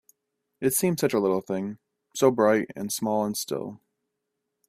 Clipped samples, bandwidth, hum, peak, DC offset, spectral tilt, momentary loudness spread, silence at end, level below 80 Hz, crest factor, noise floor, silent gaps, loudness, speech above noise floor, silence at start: under 0.1%; 16 kHz; none; -6 dBFS; under 0.1%; -4.5 dB/octave; 11 LU; 0.95 s; -66 dBFS; 22 dB; -82 dBFS; none; -25 LUFS; 57 dB; 0.6 s